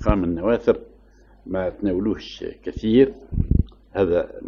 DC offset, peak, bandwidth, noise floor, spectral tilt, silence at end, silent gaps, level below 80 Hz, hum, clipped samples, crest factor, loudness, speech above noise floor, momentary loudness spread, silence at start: under 0.1%; -4 dBFS; 7 kHz; -51 dBFS; -9 dB/octave; 0 s; none; -32 dBFS; none; under 0.1%; 18 dB; -22 LUFS; 30 dB; 12 LU; 0 s